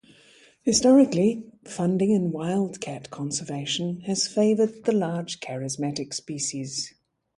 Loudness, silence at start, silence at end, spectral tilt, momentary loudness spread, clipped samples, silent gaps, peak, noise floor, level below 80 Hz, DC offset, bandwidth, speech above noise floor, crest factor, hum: -25 LUFS; 0.65 s; 0.5 s; -5 dB/octave; 14 LU; under 0.1%; none; -8 dBFS; -56 dBFS; -64 dBFS; under 0.1%; 11.5 kHz; 31 dB; 16 dB; none